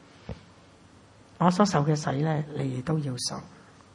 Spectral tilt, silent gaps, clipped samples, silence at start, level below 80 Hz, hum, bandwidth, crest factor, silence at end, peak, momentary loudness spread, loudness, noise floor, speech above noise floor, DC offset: -6 dB/octave; none; under 0.1%; 0.25 s; -58 dBFS; none; 11.5 kHz; 24 dB; 0.45 s; -6 dBFS; 21 LU; -27 LUFS; -54 dBFS; 28 dB; under 0.1%